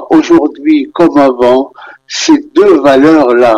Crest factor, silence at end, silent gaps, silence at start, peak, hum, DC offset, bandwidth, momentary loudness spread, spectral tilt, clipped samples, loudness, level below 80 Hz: 8 dB; 0 s; none; 0 s; 0 dBFS; none; under 0.1%; 8.6 kHz; 7 LU; -4.5 dB/octave; 0.2%; -7 LUFS; -44 dBFS